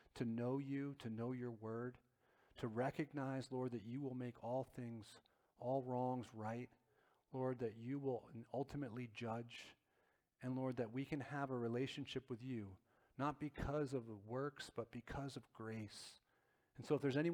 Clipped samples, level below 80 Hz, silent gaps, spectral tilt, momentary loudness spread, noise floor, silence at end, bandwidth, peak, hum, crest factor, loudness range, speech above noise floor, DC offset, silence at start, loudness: under 0.1%; -70 dBFS; none; -7 dB/octave; 10 LU; -82 dBFS; 0 s; 14.5 kHz; -26 dBFS; none; 20 dB; 2 LU; 36 dB; under 0.1%; 0.15 s; -46 LUFS